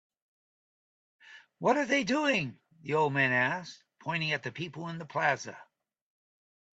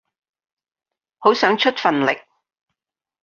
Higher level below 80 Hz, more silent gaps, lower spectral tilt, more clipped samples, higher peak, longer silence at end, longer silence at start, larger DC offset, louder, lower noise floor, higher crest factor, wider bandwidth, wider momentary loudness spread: second, -76 dBFS vs -68 dBFS; neither; about the same, -5 dB/octave vs -4.5 dB/octave; neither; second, -12 dBFS vs -2 dBFS; about the same, 1.1 s vs 1.05 s; about the same, 1.25 s vs 1.2 s; neither; second, -30 LUFS vs -18 LUFS; first, under -90 dBFS vs -85 dBFS; about the same, 22 dB vs 20 dB; first, 9 kHz vs 7.2 kHz; first, 14 LU vs 5 LU